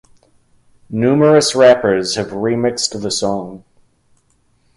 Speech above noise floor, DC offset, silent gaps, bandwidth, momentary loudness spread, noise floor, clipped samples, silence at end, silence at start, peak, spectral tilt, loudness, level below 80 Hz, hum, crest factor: 44 dB; under 0.1%; none; 11.5 kHz; 11 LU; -58 dBFS; under 0.1%; 1.2 s; 0.9 s; 0 dBFS; -4.5 dB/octave; -14 LUFS; -52 dBFS; none; 16 dB